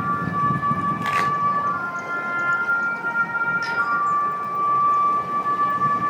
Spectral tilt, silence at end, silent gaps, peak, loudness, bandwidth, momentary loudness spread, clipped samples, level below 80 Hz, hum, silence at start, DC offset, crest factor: -6 dB/octave; 0 s; none; -8 dBFS; -21 LUFS; 19 kHz; 4 LU; under 0.1%; -58 dBFS; none; 0 s; under 0.1%; 14 dB